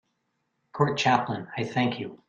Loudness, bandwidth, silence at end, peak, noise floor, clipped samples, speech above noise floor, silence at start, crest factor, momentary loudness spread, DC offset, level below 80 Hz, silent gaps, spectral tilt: -26 LUFS; 8.6 kHz; 0.1 s; -8 dBFS; -77 dBFS; under 0.1%; 50 dB; 0.75 s; 20 dB; 9 LU; under 0.1%; -64 dBFS; none; -5.5 dB/octave